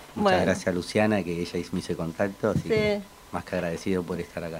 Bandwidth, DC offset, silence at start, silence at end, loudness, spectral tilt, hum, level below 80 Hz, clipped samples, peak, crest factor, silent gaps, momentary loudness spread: 16 kHz; under 0.1%; 0 s; 0 s; -27 LUFS; -6 dB/octave; none; -54 dBFS; under 0.1%; -8 dBFS; 18 dB; none; 9 LU